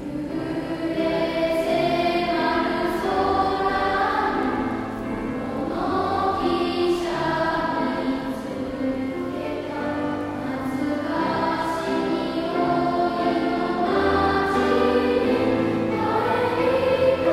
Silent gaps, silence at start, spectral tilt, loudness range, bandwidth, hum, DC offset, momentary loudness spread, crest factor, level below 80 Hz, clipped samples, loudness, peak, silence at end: none; 0 s; -6 dB/octave; 5 LU; 15 kHz; none; under 0.1%; 8 LU; 14 dB; -48 dBFS; under 0.1%; -23 LUFS; -8 dBFS; 0 s